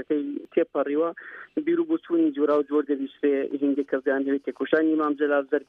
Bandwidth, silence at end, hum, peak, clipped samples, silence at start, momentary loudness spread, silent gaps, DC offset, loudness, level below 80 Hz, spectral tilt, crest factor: 4.1 kHz; 0.05 s; none; -6 dBFS; under 0.1%; 0 s; 6 LU; none; under 0.1%; -25 LUFS; -76 dBFS; -8 dB/octave; 18 dB